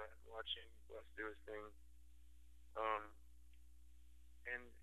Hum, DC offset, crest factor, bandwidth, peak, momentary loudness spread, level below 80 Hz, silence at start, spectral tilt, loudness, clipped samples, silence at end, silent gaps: 60 Hz at -65 dBFS; under 0.1%; 24 dB; 13 kHz; -28 dBFS; 25 LU; -66 dBFS; 0 s; -4 dB/octave; -49 LUFS; under 0.1%; 0 s; none